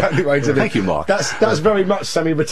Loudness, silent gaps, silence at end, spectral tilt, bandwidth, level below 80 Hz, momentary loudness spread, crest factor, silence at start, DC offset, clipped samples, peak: -17 LUFS; none; 0 s; -5 dB/octave; 13.5 kHz; -46 dBFS; 3 LU; 14 dB; 0 s; 3%; under 0.1%; -2 dBFS